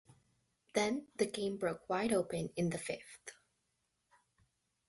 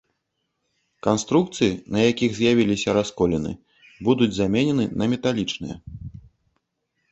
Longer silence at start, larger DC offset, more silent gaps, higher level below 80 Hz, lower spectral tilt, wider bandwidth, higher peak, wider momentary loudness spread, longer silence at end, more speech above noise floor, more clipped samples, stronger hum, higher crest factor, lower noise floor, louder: second, 0.75 s vs 1.05 s; neither; neither; second, -72 dBFS vs -48 dBFS; about the same, -5 dB/octave vs -5.5 dB/octave; first, 12 kHz vs 8.2 kHz; second, -18 dBFS vs -4 dBFS; second, 12 LU vs 15 LU; first, 1.55 s vs 1 s; second, 46 dB vs 55 dB; neither; neither; about the same, 22 dB vs 20 dB; first, -83 dBFS vs -76 dBFS; second, -37 LUFS vs -22 LUFS